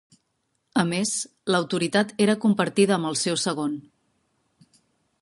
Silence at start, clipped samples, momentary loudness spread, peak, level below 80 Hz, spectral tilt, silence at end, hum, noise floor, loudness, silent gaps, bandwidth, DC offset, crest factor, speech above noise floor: 0.75 s; under 0.1%; 7 LU; -6 dBFS; -70 dBFS; -4 dB/octave; 1.4 s; none; -74 dBFS; -23 LUFS; none; 11.5 kHz; under 0.1%; 20 dB; 51 dB